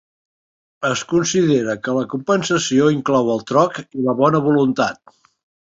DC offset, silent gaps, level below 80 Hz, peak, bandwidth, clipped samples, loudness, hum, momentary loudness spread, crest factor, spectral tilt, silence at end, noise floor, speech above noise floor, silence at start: under 0.1%; none; -58 dBFS; -2 dBFS; 8 kHz; under 0.1%; -18 LUFS; none; 6 LU; 16 dB; -5 dB/octave; 0.75 s; under -90 dBFS; over 73 dB; 0.8 s